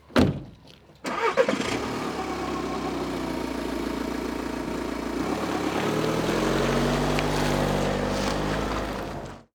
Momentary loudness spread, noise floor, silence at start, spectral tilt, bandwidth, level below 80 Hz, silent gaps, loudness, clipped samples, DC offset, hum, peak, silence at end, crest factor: 7 LU; -51 dBFS; 0.1 s; -5 dB/octave; over 20 kHz; -40 dBFS; none; -27 LUFS; under 0.1%; under 0.1%; none; -8 dBFS; 0.15 s; 20 dB